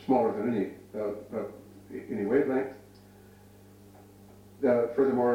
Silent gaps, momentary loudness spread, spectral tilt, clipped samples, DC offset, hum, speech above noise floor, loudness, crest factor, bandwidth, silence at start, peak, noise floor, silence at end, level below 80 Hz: none; 17 LU; -8 dB/octave; under 0.1%; under 0.1%; 50 Hz at -60 dBFS; 26 dB; -29 LUFS; 16 dB; 16.5 kHz; 0 s; -14 dBFS; -54 dBFS; 0 s; -66 dBFS